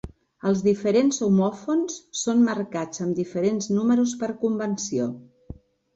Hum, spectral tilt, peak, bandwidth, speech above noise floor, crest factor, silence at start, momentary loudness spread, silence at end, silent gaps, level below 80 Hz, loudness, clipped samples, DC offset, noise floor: none; -5.5 dB/octave; -10 dBFS; 8.2 kHz; 21 dB; 14 dB; 0.05 s; 9 LU; 0.45 s; none; -56 dBFS; -24 LUFS; under 0.1%; under 0.1%; -44 dBFS